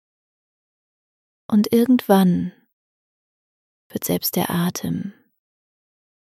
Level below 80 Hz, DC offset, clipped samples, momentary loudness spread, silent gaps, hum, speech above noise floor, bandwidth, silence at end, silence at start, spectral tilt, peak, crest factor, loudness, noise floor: -62 dBFS; under 0.1%; under 0.1%; 14 LU; 2.73-3.90 s; none; over 71 dB; 16 kHz; 1.25 s; 1.5 s; -6 dB/octave; -2 dBFS; 20 dB; -20 LUFS; under -90 dBFS